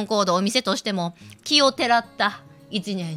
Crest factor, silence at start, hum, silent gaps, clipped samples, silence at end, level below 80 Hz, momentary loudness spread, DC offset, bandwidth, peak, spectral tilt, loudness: 20 dB; 0 s; none; none; under 0.1%; 0 s; -66 dBFS; 13 LU; under 0.1%; 16 kHz; -4 dBFS; -3.5 dB/octave; -22 LUFS